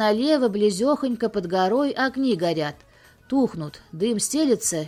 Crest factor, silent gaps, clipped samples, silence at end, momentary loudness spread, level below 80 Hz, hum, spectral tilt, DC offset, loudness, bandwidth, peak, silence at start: 14 dB; none; under 0.1%; 0 s; 7 LU; -58 dBFS; none; -4 dB/octave; under 0.1%; -23 LUFS; 16 kHz; -8 dBFS; 0 s